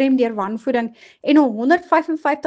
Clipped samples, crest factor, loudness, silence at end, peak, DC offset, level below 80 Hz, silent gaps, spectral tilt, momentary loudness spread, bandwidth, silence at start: under 0.1%; 16 dB; -18 LUFS; 0 s; 0 dBFS; under 0.1%; -66 dBFS; none; -6 dB/octave; 8 LU; 7.8 kHz; 0 s